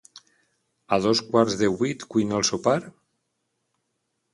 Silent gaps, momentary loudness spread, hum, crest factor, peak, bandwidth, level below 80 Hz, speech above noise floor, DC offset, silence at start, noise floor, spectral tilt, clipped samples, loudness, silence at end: none; 6 LU; none; 20 dB; -4 dBFS; 11.5 kHz; -60 dBFS; 54 dB; under 0.1%; 0.9 s; -77 dBFS; -4.5 dB/octave; under 0.1%; -23 LUFS; 1.45 s